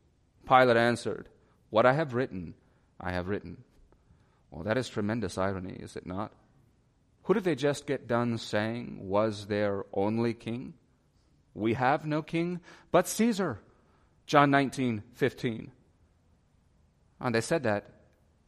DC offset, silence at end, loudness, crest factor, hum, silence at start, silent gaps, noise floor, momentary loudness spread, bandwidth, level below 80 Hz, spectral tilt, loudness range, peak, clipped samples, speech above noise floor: under 0.1%; 0.65 s; -29 LUFS; 24 dB; none; 0.45 s; none; -67 dBFS; 17 LU; 14.5 kHz; -62 dBFS; -5.5 dB/octave; 7 LU; -6 dBFS; under 0.1%; 38 dB